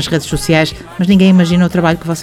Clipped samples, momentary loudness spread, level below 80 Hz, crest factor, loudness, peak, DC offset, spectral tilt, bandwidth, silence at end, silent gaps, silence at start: under 0.1%; 8 LU; -34 dBFS; 12 dB; -12 LUFS; 0 dBFS; under 0.1%; -6 dB/octave; 14 kHz; 0 s; none; 0 s